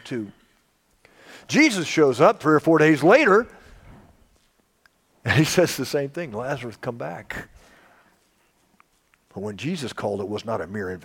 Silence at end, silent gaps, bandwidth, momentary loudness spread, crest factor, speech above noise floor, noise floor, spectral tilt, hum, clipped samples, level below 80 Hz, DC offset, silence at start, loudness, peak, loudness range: 0.05 s; none; 17 kHz; 18 LU; 20 dB; 43 dB; -64 dBFS; -5 dB/octave; none; under 0.1%; -58 dBFS; under 0.1%; 0.05 s; -21 LUFS; -2 dBFS; 16 LU